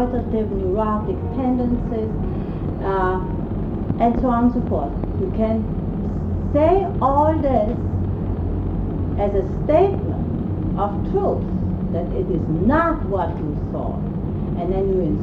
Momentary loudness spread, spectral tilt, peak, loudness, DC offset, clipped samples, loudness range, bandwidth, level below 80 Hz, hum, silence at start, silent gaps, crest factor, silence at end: 8 LU; -10.5 dB/octave; -4 dBFS; -21 LUFS; under 0.1%; under 0.1%; 2 LU; 4.9 kHz; -30 dBFS; none; 0 s; none; 16 dB; 0 s